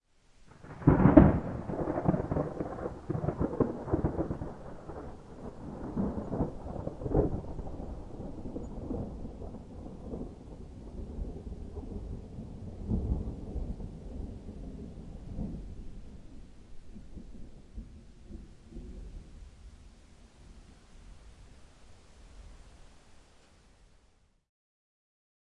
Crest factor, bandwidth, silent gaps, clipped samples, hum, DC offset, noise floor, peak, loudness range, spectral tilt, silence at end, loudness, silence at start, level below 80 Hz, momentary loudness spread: 32 dB; 10.5 kHz; none; under 0.1%; none; under 0.1%; -66 dBFS; -2 dBFS; 25 LU; -10 dB/octave; 2.25 s; -33 LUFS; 0.4 s; -44 dBFS; 21 LU